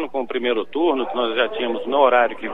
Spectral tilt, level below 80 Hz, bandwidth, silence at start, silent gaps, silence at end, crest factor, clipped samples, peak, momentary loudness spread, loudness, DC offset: -6 dB/octave; -60 dBFS; 4.8 kHz; 0 s; none; 0 s; 18 dB; under 0.1%; -4 dBFS; 7 LU; -20 LUFS; 2%